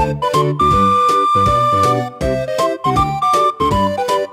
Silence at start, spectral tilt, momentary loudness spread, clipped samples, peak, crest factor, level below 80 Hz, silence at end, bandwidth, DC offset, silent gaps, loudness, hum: 0 s; -5.5 dB/octave; 6 LU; under 0.1%; -2 dBFS; 12 dB; -34 dBFS; 0 s; 16 kHz; under 0.1%; none; -14 LUFS; none